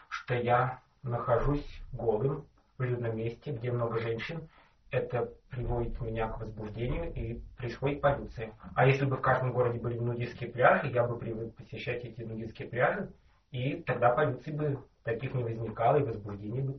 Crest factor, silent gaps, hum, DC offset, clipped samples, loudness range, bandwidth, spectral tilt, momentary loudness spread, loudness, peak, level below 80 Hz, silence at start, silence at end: 22 dB; none; none; under 0.1%; under 0.1%; 6 LU; 6.2 kHz; -6 dB/octave; 13 LU; -32 LUFS; -10 dBFS; -48 dBFS; 0.1 s; 0 s